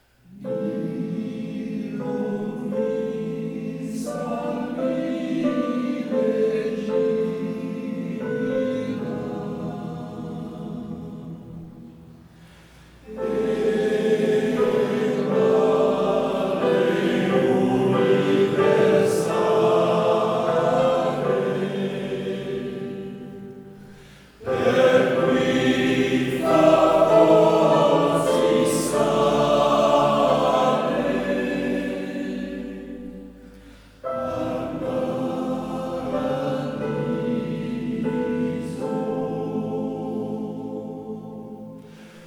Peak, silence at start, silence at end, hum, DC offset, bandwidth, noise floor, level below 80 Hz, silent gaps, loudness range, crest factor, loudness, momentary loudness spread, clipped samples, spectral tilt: -2 dBFS; 0.3 s; 0 s; none; under 0.1%; 18 kHz; -48 dBFS; -54 dBFS; none; 12 LU; 20 dB; -22 LUFS; 15 LU; under 0.1%; -6 dB/octave